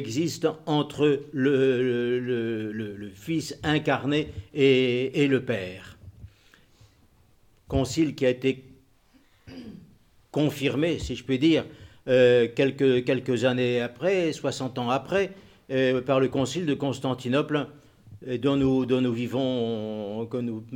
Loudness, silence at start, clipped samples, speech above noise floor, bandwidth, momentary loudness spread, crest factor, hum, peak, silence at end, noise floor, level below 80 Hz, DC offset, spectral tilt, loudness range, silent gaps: -25 LUFS; 0 s; under 0.1%; 35 dB; 16.5 kHz; 11 LU; 18 dB; none; -8 dBFS; 0 s; -60 dBFS; -52 dBFS; under 0.1%; -6 dB/octave; 7 LU; none